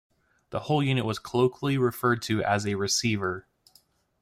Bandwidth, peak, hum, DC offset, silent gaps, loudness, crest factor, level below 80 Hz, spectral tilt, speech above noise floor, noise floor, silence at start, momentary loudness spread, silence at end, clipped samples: 16 kHz; -12 dBFS; none; under 0.1%; none; -27 LUFS; 16 dB; -62 dBFS; -5 dB/octave; 37 dB; -63 dBFS; 0.5 s; 7 LU; 0.8 s; under 0.1%